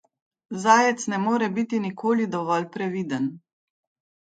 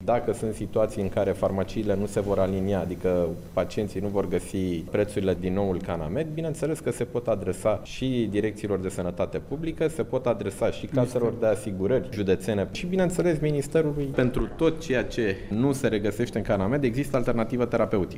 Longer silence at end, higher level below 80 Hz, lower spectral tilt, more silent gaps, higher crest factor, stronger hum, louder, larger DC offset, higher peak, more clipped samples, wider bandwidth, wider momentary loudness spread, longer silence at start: first, 0.95 s vs 0 s; second, -74 dBFS vs -42 dBFS; second, -5 dB/octave vs -7 dB/octave; neither; about the same, 22 dB vs 18 dB; neither; first, -24 LUFS vs -27 LUFS; neither; first, -2 dBFS vs -8 dBFS; neither; second, 9.2 kHz vs 16 kHz; first, 11 LU vs 5 LU; first, 0.5 s vs 0 s